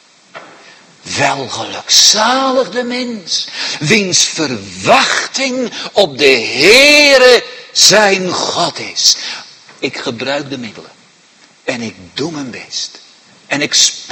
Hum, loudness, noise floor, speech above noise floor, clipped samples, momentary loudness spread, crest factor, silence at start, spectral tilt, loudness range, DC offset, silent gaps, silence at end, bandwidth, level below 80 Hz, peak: none; -10 LUFS; -46 dBFS; 34 dB; 0.9%; 17 LU; 14 dB; 0.35 s; -1.5 dB/octave; 14 LU; under 0.1%; none; 0 s; 16 kHz; -54 dBFS; 0 dBFS